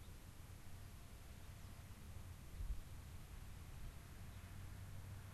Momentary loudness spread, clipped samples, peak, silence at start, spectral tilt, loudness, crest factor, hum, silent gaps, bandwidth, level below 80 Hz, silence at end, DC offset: 6 LU; under 0.1%; -36 dBFS; 0 s; -5 dB/octave; -57 LUFS; 18 dB; none; none; 13 kHz; -56 dBFS; 0 s; under 0.1%